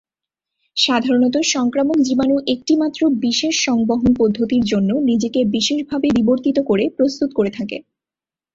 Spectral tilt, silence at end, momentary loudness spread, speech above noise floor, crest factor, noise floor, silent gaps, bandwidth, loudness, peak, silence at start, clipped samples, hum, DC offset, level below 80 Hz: -4 dB/octave; 0.75 s; 4 LU; over 73 dB; 16 dB; under -90 dBFS; none; 7.8 kHz; -17 LUFS; -2 dBFS; 0.75 s; under 0.1%; none; under 0.1%; -50 dBFS